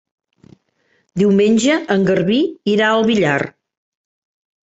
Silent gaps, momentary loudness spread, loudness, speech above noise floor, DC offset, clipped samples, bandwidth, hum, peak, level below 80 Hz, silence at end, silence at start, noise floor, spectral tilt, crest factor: none; 6 LU; -15 LUFS; 48 dB; under 0.1%; under 0.1%; 8 kHz; none; -2 dBFS; -56 dBFS; 1.15 s; 1.15 s; -63 dBFS; -5.5 dB/octave; 16 dB